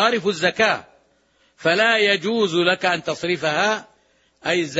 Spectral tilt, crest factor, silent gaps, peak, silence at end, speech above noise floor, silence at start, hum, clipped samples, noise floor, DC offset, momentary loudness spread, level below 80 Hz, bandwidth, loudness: -3.5 dB/octave; 16 dB; none; -4 dBFS; 0 s; 42 dB; 0 s; none; under 0.1%; -61 dBFS; under 0.1%; 8 LU; -66 dBFS; 8 kHz; -20 LUFS